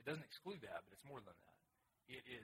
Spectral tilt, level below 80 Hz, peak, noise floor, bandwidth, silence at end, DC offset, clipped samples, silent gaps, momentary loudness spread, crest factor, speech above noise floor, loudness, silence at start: -5 dB/octave; -84 dBFS; -32 dBFS; -84 dBFS; 16 kHz; 0 s; under 0.1%; under 0.1%; none; 8 LU; 22 dB; 29 dB; -54 LUFS; 0 s